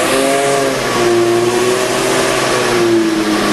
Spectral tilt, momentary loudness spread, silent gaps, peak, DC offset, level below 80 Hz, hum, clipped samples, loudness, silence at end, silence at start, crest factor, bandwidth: -3.5 dB/octave; 2 LU; none; -2 dBFS; under 0.1%; -42 dBFS; none; under 0.1%; -13 LUFS; 0 s; 0 s; 12 dB; 12.5 kHz